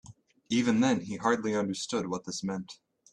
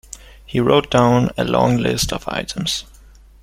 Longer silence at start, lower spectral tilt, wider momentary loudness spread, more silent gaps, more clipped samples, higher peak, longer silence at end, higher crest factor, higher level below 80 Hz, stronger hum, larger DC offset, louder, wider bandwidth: about the same, 0.1 s vs 0.15 s; about the same, -4.5 dB/octave vs -5 dB/octave; about the same, 10 LU vs 10 LU; neither; neither; second, -10 dBFS vs 0 dBFS; second, 0.4 s vs 0.6 s; about the same, 20 dB vs 18 dB; second, -68 dBFS vs -40 dBFS; neither; neither; second, -30 LUFS vs -18 LUFS; second, 10.5 kHz vs 16 kHz